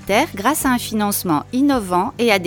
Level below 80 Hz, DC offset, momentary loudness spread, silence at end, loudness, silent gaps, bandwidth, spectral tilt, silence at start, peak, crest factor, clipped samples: -44 dBFS; under 0.1%; 3 LU; 0 s; -18 LUFS; none; 19 kHz; -4 dB/octave; 0 s; 0 dBFS; 18 dB; under 0.1%